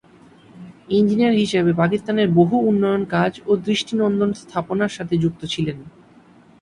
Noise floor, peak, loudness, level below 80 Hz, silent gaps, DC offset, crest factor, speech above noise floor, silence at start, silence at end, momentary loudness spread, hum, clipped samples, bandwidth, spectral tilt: -49 dBFS; -4 dBFS; -19 LUFS; -54 dBFS; none; under 0.1%; 16 dB; 31 dB; 0.55 s; 0.7 s; 8 LU; none; under 0.1%; 10.5 kHz; -6.5 dB/octave